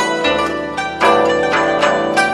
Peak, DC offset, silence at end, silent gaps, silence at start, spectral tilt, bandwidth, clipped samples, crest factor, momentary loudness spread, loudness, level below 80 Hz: 0 dBFS; under 0.1%; 0 s; none; 0 s; -3.5 dB/octave; 13 kHz; under 0.1%; 14 dB; 7 LU; -15 LUFS; -44 dBFS